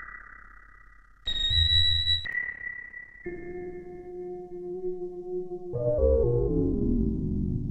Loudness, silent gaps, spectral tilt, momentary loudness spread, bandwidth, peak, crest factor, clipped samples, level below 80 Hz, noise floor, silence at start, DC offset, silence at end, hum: -27 LUFS; none; -6 dB/octave; 19 LU; 8.4 kHz; -10 dBFS; 18 dB; under 0.1%; -36 dBFS; -53 dBFS; 0 s; under 0.1%; 0 s; none